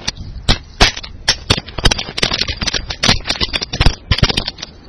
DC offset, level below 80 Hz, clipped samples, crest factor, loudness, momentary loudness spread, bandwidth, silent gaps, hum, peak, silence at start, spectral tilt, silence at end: under 0.1%; -24 dBFS; 0.3%; 16 dB; -16 LUFS; 5 LU; 12 kHz; none; none; 0 dBFS; 0 s; -3 dB/octave; 0 s